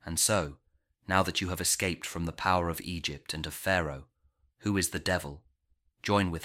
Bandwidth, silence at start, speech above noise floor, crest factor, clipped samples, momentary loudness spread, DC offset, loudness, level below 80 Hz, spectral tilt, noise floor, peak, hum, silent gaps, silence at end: 16.5 kHz; 0.05 s; 42 dB; 22 dB; under 0.1%; 11 LU; under 0.1%; -30 LUFS; -52 dBFS; -3.5 dB/octave; -73 dBFS; -10 dBFS; none; none; 0 s